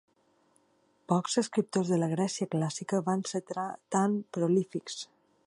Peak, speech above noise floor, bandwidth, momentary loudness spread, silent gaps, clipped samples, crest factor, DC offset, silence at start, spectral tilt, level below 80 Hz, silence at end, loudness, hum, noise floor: -10 dBFS; 39 dB; 11 kHz; 8 LU; none; under 0.1%; 22 dB; under 0.1%; 1.1 s; -5.5 dB/octave; -78 dBFS; 0.45 s; -31 LUFS; none; -69 dBFS